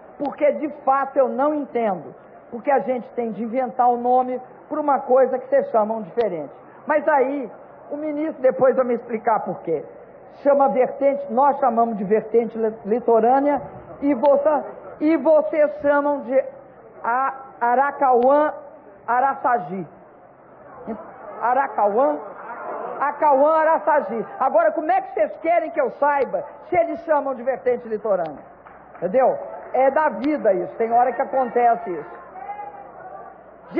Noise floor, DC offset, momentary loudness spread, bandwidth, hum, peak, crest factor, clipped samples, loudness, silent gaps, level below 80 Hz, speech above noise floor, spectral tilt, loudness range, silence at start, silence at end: -47 dBFS; under 0.1%; 16 LU; 4.9 kHz; none; -6 dBFS; 14 dB; under 0.1%; -20 LUFS; none; -64 dBFS; 27 dB; -10 dB/octave; 4 LU; 0 s; 0 s